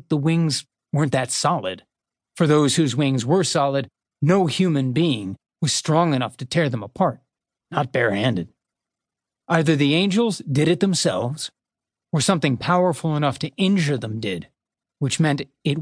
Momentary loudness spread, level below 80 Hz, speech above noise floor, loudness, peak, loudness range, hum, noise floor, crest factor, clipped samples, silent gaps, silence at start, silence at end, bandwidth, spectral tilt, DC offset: 9 LU; -62 dBFS; 68 dB; -21 LUFS; -4 dBFS; 3 LU; none; -88 dBFS; 18 dB; under 0.1%; none; 0.1 s; 0 s; 10.5 kHz; -5 dB/octave; under 0.1%